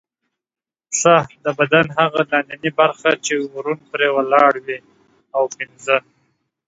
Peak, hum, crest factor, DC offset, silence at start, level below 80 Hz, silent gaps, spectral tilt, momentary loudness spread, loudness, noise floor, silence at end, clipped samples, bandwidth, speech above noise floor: 0 dBFS; none; 18 dB; under 0.1%; 0.9 s; -64 dBFS; none; -3.5 dB/octave; 11 LU; -17 LUFS; under -90 dBFS; 0.7 s; under 0.1%; 8 kHz; over 73 dB